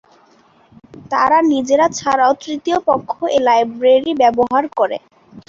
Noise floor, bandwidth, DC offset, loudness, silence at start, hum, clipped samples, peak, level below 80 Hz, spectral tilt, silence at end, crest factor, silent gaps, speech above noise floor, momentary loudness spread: -51 dBFS; 7.6 kHz; under 0.1%; -15 LUFS; 0.95 s; none; under 0.1%; -2 dBFS; -56 dBFS; -4 dB/octave; 0.1 s; 14 dB; none; 37 dB; 7 LU